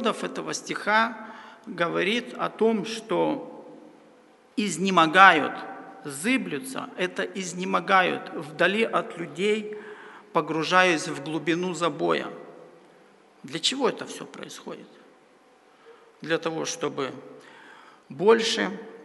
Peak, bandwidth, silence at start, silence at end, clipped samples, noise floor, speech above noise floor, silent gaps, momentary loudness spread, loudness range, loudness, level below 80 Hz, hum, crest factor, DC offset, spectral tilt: 0 dBFS; 11.5 kHz; 0 s; 0 s; under 0.1%; -57 dBFS; 32 dB; none; 20 LU; 10 LU; -24 LUFS; -78 dBFS; none; 26 dB; under 0.1%; -3.5 dB/octave